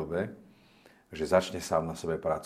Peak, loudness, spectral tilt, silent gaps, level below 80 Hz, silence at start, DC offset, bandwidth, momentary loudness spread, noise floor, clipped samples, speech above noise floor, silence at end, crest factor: -10 dBFS; -31 LUFS; -5 dB/octave; none; -60 dBFS; 0 s; under 0.1%; 15 kHz; 11 LU; -60 dBFS; under 0.1%; 30 dB; 0 s; 22 dB